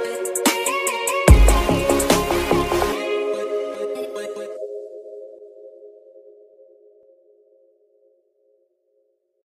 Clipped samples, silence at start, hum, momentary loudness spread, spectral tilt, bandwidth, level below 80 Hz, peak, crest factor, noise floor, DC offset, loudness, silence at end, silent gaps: under 0.1%; 0 s; none; 22 LU; -4.5 dB/octave; 15.5 kHz; -26 dBFS; 0 dBFS; 20 dB; -67 dBFS; under 0.1%; -20 LUFS; 3.6 s; none